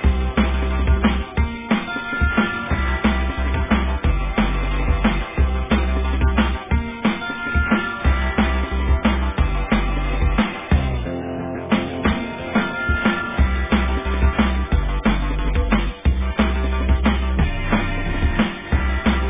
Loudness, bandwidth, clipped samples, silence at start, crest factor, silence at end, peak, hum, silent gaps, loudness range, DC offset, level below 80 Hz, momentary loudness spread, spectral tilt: -21 LUFS; 3.8 kHz; under 0.1%; 0 s; 16 dB; 0 s; -4 dBFS; none; none; 1 LU; under 0.1%; -22 dBFS; 4 LU; -10.5 dB/octave